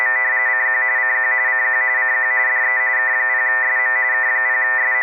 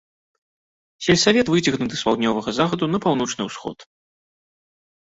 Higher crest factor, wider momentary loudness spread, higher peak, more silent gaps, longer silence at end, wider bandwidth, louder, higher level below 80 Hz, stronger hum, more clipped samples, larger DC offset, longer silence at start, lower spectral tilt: second, 10 dB vs 20 dB; second, 0 LU vs 12 LU; second, -8 dBFS vs -2 dBFS; neither; second, 0 s vs 1.2 s; second, 2.8 kHz vs 8 kHz; first, -15 LUFS vs -20 LUFS; second, under -90 dBFS vs -54 dBFS; neither; neither; neither; second, 0 s vs 1 s; second, 0 dB/octave vs -4.5 dB/octave